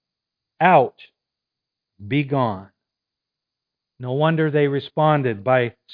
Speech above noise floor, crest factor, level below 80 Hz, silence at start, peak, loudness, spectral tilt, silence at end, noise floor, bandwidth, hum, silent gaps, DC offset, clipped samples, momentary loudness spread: 66 dB; 22 dB; -66 dBFS; 0.6 s; 0 dBFS; -20 LUFS; -10.5 dB/octave; 0.2 s; -85 dBFS; 5 kHz; none; none; under 0.1%; under 0.1%; 10 LU